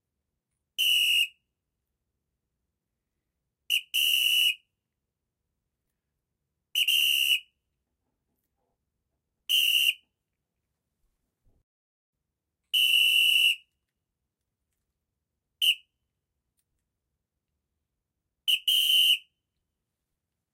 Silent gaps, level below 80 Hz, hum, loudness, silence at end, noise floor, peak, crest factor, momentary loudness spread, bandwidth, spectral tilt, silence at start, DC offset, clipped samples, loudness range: 11.63-12.13 s; -84 dBFS; none; -22 LUFS; 1.35 s; -85 dBFS; -12 dBFS; 20 dB; 11 LU; 16 kHz; 7 dB/octave; 0.8 s; under 0.1%; under 0.1%; 8 LU